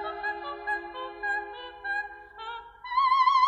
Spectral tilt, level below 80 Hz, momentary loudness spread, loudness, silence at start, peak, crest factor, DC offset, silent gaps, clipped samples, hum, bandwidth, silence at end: -2.5 dB/octave; -62 dBFS; 17 LU; -29 LUFS; 0 s; -12 dBFS; 18 dB; under 0.1%; none; under 0.1%; none; 8.8 kHz; 0 s